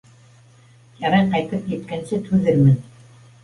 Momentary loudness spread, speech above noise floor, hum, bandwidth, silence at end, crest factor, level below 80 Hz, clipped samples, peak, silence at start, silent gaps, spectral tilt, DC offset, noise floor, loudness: 11 LU; 32 dB; none; 11 kHz; 0.6 s; 16 dB; -50 dBFS; under 0.1%; -4 dBFS; 1 s; none; -8 dB/octave; under 0.1%; -50 dBFS; -20 LUFS